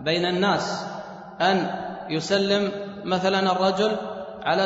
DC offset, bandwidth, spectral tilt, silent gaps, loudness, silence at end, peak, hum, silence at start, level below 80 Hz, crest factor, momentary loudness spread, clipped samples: under 0.1%; 8 kHz; -5 dB/octave; none; -24 LUFS; 0 s; -8 dBFS; none; 0 s; -60 dBFS; 16 dB; 11 LU; under 0.1%